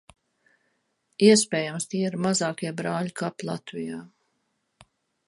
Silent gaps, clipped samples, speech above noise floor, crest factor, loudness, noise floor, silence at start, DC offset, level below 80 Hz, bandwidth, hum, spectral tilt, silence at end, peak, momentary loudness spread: none; under 0.1%; 50 dB; 22 dB; -25 LUFS; -75 dBFS; 1.2 s; under 0.1%; -70 dBFS; 11.5 kHz; none; -4 dB/octave; 1.2 s; -4 dBFS; 16 LU